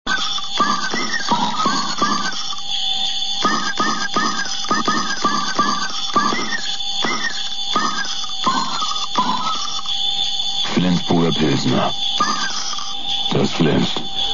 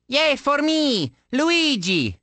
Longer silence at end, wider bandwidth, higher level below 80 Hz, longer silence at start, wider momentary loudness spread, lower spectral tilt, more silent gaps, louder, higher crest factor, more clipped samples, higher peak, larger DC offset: about the same, 0 s vs 0.1 s; second, 7.4 kHz vs 9.2 kHz; about the same, -52 dBFS vs -56 dBFS; about the same, 0.05 s vs 0.1 s; about the same, 4 LU vs 5 LU; about the same, -3 dB/octave vs -4 dB/octave; neither; about the same, -19 LUFS vs -20 LUFS; about the same, 16 dB vs 16 dB; neither; about the same, -4 dBFS vs -6 dBFS; first, 6% vs under 0.1%